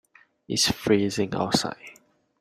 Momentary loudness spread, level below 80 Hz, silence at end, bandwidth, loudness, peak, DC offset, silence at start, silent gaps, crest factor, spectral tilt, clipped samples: 9 LU; -56 dBFS; 0.5 s; 15.5 kHz; -24 LUFS; -8 dBFS; under 0.1%; 0.5 s; none; 20 dB; -3.5 dB/octave; under 0.1%